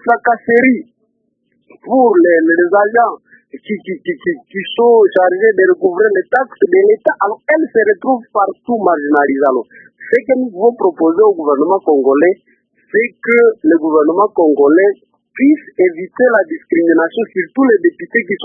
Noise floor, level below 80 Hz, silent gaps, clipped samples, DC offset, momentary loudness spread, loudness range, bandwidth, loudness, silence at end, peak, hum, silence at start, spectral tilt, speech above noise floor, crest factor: -64 dBFS; -64 dBFS; none; under 0.1%; under 0.1%; 9 LU; 2 LU; 3.6 kHz; -12 LUFS; 0 s; 0 dBFS; none; 0.05 s; -8.5 dB/octave; 52 dB; 12 dB